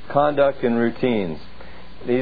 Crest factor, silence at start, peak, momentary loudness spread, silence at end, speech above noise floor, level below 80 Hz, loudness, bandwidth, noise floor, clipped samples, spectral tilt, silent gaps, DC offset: 18 dB; 0.05 s; -4 dBFS; 17 LU; 0 s; 22 dB; -48 dBFS; -21 LUFS; 5 kHz; -42 dBFS; under 0.1%; -9.5 dB/octave; none; 3%